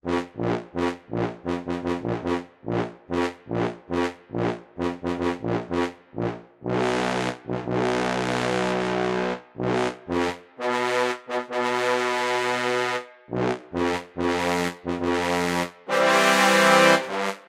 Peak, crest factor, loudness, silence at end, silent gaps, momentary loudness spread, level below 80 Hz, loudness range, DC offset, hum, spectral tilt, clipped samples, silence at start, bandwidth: -2 dBFS; 24 dB; -24 LUFS; 0.1 s; none; 11 LU; -54 dBFS; 7 LU; under 0.1%; none; -4.5 dB/octave; under 0.1%; 0.05 s; 16 kHz